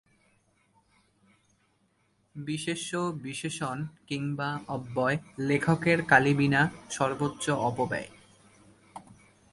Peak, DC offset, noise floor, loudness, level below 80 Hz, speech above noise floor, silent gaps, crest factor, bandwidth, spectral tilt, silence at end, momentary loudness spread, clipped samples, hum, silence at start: -6 dBFS; under 0.1%; -70 dBFS; -28 LUFS; -62 dBFS; 42 dB; none; 26 dB; 11.5 kHz; -5.5 dB/octave; 0.4 s; 18 LU; under 0.1%; none; 2.35 s